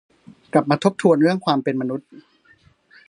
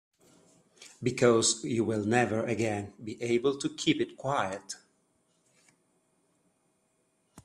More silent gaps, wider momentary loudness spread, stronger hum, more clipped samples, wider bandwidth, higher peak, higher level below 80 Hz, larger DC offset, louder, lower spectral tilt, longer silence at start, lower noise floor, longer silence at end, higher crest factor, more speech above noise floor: neither; second, 10 LU vs 13 LU; neither; neither; second, 11 kHz vs 12.5 kHz; first, -2 dBFS vs -8 dBFS; about the same, -66 dBFS vs -68 dBFS; neither; first, -19 LUFS vs -29 LUFS; first, -6.5 dB/octave vs -4 dB/octave; second, 0.55 s vs 0.8 s; second, -56 dBFS vs -74 dBFS; first, 0.9 s vs 0.05 s; about the same, 20 dB vs 22 dB; second, 37 dB vs 45 dB